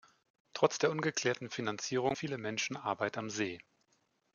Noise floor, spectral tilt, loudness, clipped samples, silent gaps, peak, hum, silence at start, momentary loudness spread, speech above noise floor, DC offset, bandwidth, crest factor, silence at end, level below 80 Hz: -76 dBFS; -4 dB/octave; -35 LUFS; under 0.1%; none; -14 dBFS; none; 0.55 s; 7 LU; 41 dB; under 0.1%; 7.4 kHz; 22 dB; 0.75 s; -76 dBFS